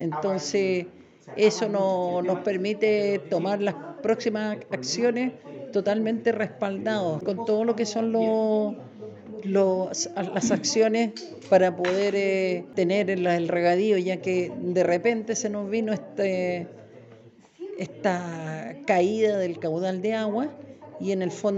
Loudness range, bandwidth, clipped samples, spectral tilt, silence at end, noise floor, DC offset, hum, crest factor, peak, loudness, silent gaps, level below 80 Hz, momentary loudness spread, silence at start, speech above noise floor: 4 LU; 8.2 kHz; under 0.1%; -5 dB/octave; 0 s; -51 dBFS; under 0.1%; none; 18 dB; -8 dBFS; -25 LUFS; none; -74 dBFS; 11 LU; 0 s; 27 dB